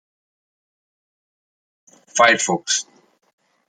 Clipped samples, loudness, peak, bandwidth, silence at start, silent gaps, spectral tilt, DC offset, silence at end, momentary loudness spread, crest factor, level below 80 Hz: under 0.1%; -17 LUFS; -2 dBFS; 10.5 kHz; 2.15 s; none; -1.5 dB/octave; under 0.1%; 0.85 s; 12 LU; 22 dB; -76 dBFS